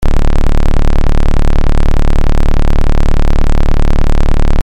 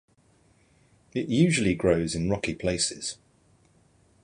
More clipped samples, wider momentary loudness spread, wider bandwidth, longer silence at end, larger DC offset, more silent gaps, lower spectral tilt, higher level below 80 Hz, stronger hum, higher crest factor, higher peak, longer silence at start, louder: neither; second, 0 LU vs 13 LU; second, 6.2 kHz vs 11.5 kHz; second, 0 s vs 1.1 s; neither; neither; first, -7 dB/octave vs -5 dB/octave; first, -8 dBFS vs -50 dBFS; neither; second, 4 dB vs 20 dB; first, -2 dBFS vs -8 dBFS; second, 0 s vs 1.15 s; first, -15 LUFS vs -26 LUFS